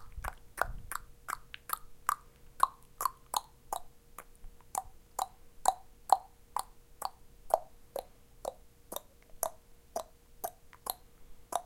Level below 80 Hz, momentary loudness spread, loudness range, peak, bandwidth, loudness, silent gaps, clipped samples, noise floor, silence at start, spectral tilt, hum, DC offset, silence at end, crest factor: -56 dBFS; 12 LU; 7 LU; -8 dBFS; 16.5 kHz; -38 LUFS; none; under 0.1%; -54 dBFS; 0 s; -1.5 dB/octave; none; under 0.1%; 0 s; 32 dB